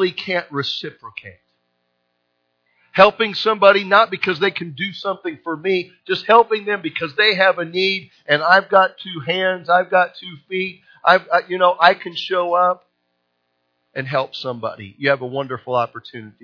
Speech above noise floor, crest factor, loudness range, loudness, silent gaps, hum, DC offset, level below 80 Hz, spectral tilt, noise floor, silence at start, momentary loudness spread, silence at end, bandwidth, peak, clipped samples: 52 dB; 18 dB; 6 LU; -18 LUFS; none; 60 Hz at -55 dBFS; under 0.1%; -66 dBFS; -5.5 dB/octave; -70 dBFS; 0 s; 14 LU; 0.15 s; 5.4 kHz; 0 dBFS; under 0.1%